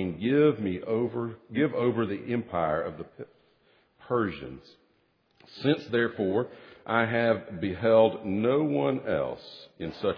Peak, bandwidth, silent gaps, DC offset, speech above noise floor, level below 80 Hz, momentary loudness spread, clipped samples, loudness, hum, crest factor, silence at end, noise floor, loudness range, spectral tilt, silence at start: -8 dBFS; 5.4 kHz; none; under 0.1%; 41 dB; -62 dBFS; 18 LU; under 0.1%; -27 LUFS; none; 20 dB; 0 s; -69 dBFS; 7 LU; -9 dB/octave; 0 s